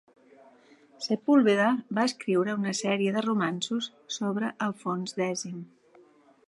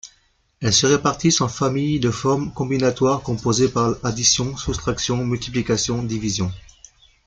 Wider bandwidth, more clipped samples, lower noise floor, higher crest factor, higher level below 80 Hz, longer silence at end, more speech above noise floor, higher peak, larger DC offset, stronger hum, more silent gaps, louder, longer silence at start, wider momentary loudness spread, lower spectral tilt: first, 11.5 kHz vs 10 kHz; neither; about the same, -59 dBFS vs -61 dBFS; about the same, 18 dB vs 18 dB; second, -80 dBFS vs -44 dBFS; first, 0.8 s vs 0.65 s; second, 31 dB vs 41 dB; second, -10 dBFS vs -2 dBFS; neither; neither; neither; second, -28 LUFS vs -20 LUFS; first, 1 s vs 0.05 s; first, 11 LU vs 7 LU; about the same, -5 dB/octave vs -4 dB/octave